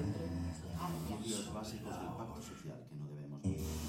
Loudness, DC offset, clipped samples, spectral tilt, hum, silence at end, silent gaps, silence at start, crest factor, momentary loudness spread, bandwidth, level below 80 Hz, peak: -43 LUFS; under 0.1%; under 0.1%; -5.5 dB/octave; none; 0 s; none; 0 s; 18 dB; 8 LU; 16.5 kHz; -54 dBFS; -24 dBFS